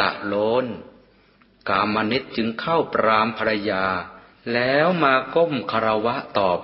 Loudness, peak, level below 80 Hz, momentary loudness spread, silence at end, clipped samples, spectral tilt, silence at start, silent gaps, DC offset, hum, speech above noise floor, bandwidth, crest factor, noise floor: -21 LUFS; -2 dBFS; -56 dBFS; 9 LU; 0 s; under 0.1%; -10 dB/octave; 0 s; none; under 0.1%; none; 35 dB; 5.8 kHz; 20 dB; -56 dBFS